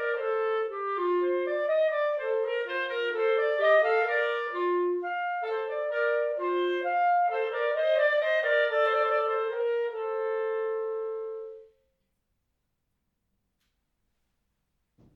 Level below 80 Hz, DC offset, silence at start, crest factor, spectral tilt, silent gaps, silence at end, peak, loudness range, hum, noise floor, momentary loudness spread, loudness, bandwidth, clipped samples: -78 dBFS; under 0.1%; 0 s; 16 dB; -3.5 dB/octave; none; 3.5 s; -12 dBFS; 9 LU; none; -79 dBFS; 7 LU; -27 LUFS; 6.2 kHz; under 0.1%